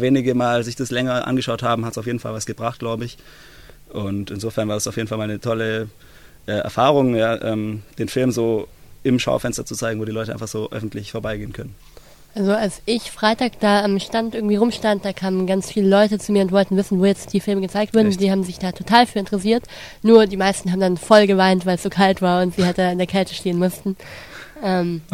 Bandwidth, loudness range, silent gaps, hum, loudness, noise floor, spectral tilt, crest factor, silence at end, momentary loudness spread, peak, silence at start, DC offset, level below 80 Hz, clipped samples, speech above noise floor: 16 kHz; 9 LU; none; none; -20 LUFS; -45 dBFS; -5.5 dB/octave; 20 dB; 0.1 s; 12 LU; 0 dBFS; 0 s; 0.3%; -48 dBFS; under 0.1%; 26 dB